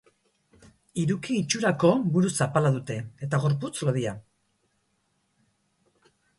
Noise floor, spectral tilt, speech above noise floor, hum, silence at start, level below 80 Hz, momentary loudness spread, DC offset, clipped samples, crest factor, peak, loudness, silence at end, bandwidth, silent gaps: -72 dBFS; -5.5 dB/octave; 47 dB; none; 0.95 s; -64 dBFS; 12 LU; under 0.1%; under 0.1%; 20 dB; -8 dBFS; -26 LUFS; 2.15 s; 11.5 kHz; none